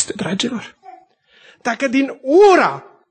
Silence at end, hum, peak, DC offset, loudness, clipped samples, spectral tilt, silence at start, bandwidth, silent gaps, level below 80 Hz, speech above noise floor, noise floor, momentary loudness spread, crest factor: 0.3 s; none; -2 dBFS; under 0.1%; -15 LUFS; under 0.1%; -4 dB/octave; 0 s; 9 kHz; none; -60 dBFS; 36 dB; -51 dBFS; 19 LU; 16 dB